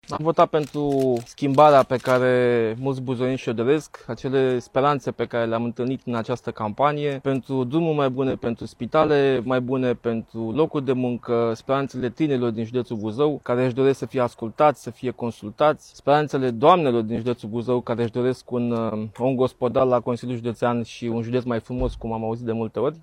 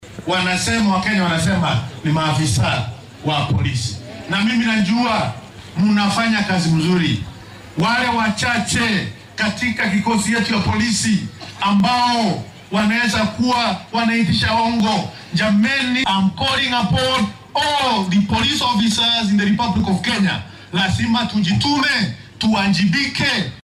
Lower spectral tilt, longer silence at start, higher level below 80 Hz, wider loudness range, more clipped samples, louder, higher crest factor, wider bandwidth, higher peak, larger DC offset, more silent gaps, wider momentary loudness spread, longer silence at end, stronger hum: first, -7 dB/octave vs -4.5 dB/octave; about the same, 0.1 s vs 0 s; second, -50 dBFS vs -44 dBFS; about the same, 4 LU vs 2 LU; neither; second, -23 LUFS vs -17 LUFS; first, 20 dB vs 10 dB; about the same, 13.5 kHz vs 13 kHz; first, -2 dBFS vs -8 dBFS; neither; neither; first, 9 LU vs 6 LU; about the same, 0 s vs 0 s; neither